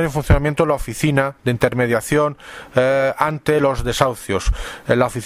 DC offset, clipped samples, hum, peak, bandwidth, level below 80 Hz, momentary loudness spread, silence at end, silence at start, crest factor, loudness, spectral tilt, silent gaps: under 0.1%; under 0.1%; none; 0 dBFS; 16 kHz; -28 dBFS; 5 LU; 0 s; 0 s; 18 dB; -18 LUFS; -5.5 dB/octave; none